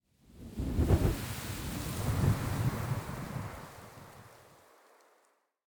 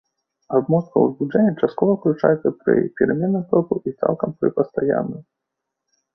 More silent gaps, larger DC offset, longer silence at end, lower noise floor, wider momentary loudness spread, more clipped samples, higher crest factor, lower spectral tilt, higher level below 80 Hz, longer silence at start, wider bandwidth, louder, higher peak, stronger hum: neither; neither; first, 1.25 s vs 0.95 s; second, -72 dBFS vs -81 dBFS; first, 21 LU vs 4 LU; neither; about the same, 20 dB vs 18 dB; second, -6 dB/octave vs -11.5 dB/octave; first, -42 dBFS vs -60 dBFS; second, 0.3 s vs 0.5 s; first, over 20 kHz vs 5.8 kHz; second, -34 LUFS vs -20 LUFS; second, -16 dBFS vs -2 dBFS; neither